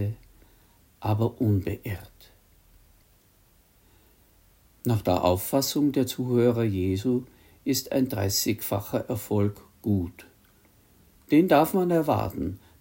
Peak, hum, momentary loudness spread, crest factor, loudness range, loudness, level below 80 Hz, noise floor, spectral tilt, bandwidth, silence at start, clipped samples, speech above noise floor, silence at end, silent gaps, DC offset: -6 dBFS; none; 12 LU; 20 dB; 7 LU; -26 LUFS; -56 dBFS; -61 dBFS; -6 dB/octave; 16.5 kHz; 0 s; under 0.1%; 36 dB; 0.25 s; none; under 0.1%